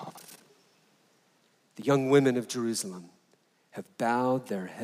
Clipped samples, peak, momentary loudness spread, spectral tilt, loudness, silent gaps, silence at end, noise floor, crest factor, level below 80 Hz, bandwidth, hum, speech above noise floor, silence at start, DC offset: under 0.1%; -12 dBFS; 23 LU; -5.5 dB/octave; -28 LUFS; none; 0 s; -68 dBFS; 20 dB; -84 dBFS; 16 kHz; none; 40 dB; 0 s; under 0.1%